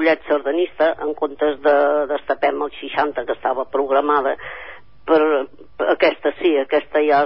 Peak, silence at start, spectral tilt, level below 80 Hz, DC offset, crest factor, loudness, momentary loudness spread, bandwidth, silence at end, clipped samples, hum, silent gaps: -4 dBFS; 0 s; -9 dB/octave; -56 dBFS; 0.8%; 16 dB; -19 LUFS; 8 LU; 5.8 kHz; 0 s; under 0.1%; none; none